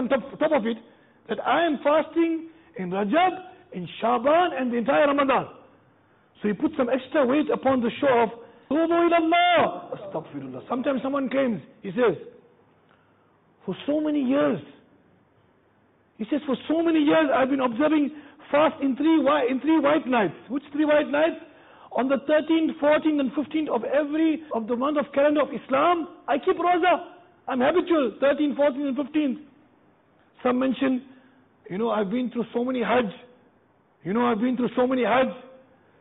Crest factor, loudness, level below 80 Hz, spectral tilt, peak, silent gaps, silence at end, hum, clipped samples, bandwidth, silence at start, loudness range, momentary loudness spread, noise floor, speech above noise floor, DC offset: 14 dB; -24 LUFS; -64 dBFS; -10 dB/octave; -10 dBFS; none; 0.55 s; none; under 0.1%; 4 kHz; 0 s; 6 LU; 12 LU; -62 dBFS; 39 dB; under 0.1%